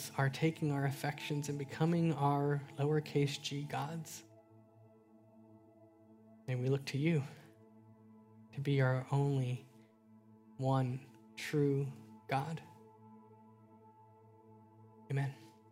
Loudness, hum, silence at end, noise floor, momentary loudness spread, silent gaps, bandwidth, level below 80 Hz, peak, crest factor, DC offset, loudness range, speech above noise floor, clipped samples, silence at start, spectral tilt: -36 LUFS; none; 0.2 s; -63 dBFS; 16 LU; none; 16 kHz; -78 dBFS; -20 dBFS; 18 dB; under 0.1%; 10 LU; 28 dB; under 0.1%; 0 s; -6.5 dB/octave